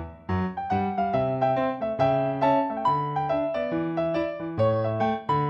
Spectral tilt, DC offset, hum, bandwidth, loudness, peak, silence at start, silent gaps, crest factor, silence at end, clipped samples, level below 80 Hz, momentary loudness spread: -9 dB/octave; under 0.1%; none; 7.8 kHz; -26 LUFS; -10 dBFS; 0 s; none; 14 dB; 0 s; under 0.1%; -54 dBFS; 5 LU